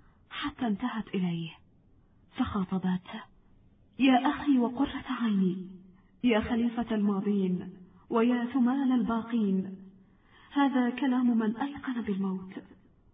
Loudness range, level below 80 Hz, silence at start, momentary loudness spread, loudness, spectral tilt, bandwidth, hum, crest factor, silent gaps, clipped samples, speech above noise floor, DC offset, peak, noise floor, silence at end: 5 LU; -58 dBFS; 0.3 s; 14 LU; -29 LUFS; -10.5 dB/octave; 4.7 kHz; none; 18 dB; none; under 0.1%; 33 dB; under 0.1%; -12 dBFS; -61 dBFS; 0.5 s